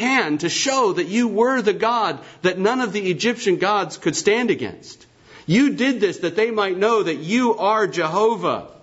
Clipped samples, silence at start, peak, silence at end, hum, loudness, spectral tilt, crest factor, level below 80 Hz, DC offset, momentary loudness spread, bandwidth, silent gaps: under 0.1%; 0 s; -4 dBFS; 0.1 s; none; -20 LUFS; -4 dB/octave; 16 dB; -64 dBFS; under 0.1%; 5 LU; 8 kHz; none